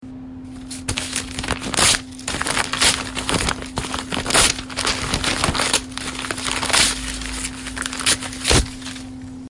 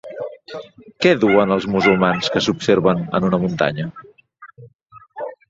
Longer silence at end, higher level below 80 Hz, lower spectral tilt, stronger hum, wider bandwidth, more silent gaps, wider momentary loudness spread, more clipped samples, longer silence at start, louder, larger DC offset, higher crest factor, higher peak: second, 0 s vs 0.15 s; first, -34 dBFS vs -52 dBFS; second, -2 dB/octave vs -6 dB/octave; neither; first, 11.5 kHz vs 7.8 kHz; second, none vs 4.75-4.79 s; second, 14 LU vs 17 LU; neither; about the same, 0 s vs 0.05 s; about the same, -19 LUFS vs -17 LUFS; neither; about the same, 22 dB vs 18 dB; about the same, 0 dBFS vs -2 dBFS